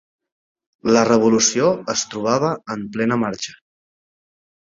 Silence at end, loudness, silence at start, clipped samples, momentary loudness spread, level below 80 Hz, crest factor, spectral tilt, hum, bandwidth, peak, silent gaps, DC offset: 1.2 s; -18 LUFS; 0.85 s; under 0.1%; 12 LU; -58 dBFS; 18 dB; -4 dB/octave; none; 7.8 kHz; -2 dBFS; none; under 0.1%